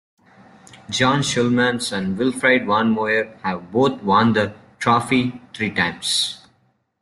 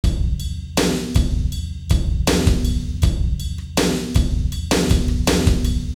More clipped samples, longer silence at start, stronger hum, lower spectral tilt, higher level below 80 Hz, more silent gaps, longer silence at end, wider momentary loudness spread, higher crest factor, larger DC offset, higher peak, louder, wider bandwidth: neither; first, 0.9 s vs 0.05 s; neither; about the same, -4.5 dB/octave vs -5 dB/octave; second, -56 dBFS vs -22 dBFS; neither; first, 0.65 s vs 0.05 s; first, 9 LU vs 6 LU; about the same, 18 dB vs 16 dB; neither; about the same, -4 dBFS vs -4 dBFS; about the same, -19 LUFS vs -20 LUFS; second, 12.5 kHz vs 18.5 kHz